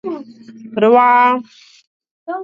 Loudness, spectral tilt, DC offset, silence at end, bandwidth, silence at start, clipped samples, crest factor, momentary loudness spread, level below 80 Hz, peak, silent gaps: -12 LUFS; -6.5 dB/octave; under 0.1%; 0 s; 7.2 kHz; 0.05 s; under 0.1%; 16 dB; 18 LU; -68 dBFS; 0 dBFS; 1.87-2.00 s, 2.11-2.26 s